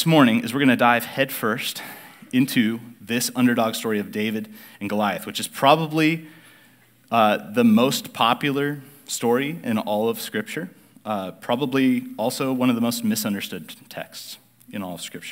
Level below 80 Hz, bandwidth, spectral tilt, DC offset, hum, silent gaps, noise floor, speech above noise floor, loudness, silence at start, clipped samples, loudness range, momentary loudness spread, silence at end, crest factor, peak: -76 dBFS; 16 kHz; -4.5 dB/octave; under 0.1%; none; none; -55 dBFS; 33 dB; -22 LUFS; 0 s; under 0.1%; 4 LU; 17 LU; 0 s; 20 dB; -2 dBFS